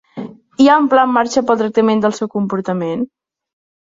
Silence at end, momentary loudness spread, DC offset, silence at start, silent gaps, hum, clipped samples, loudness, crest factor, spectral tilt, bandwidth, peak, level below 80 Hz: 0.9 s; 16 LU; under 0.1%; 0.15 s; none; none; under 0.1%; -15 LUFS; 14 dB; -5.5 dB/octave; 7.8 kHz; -2 dBFS; -58 dBFS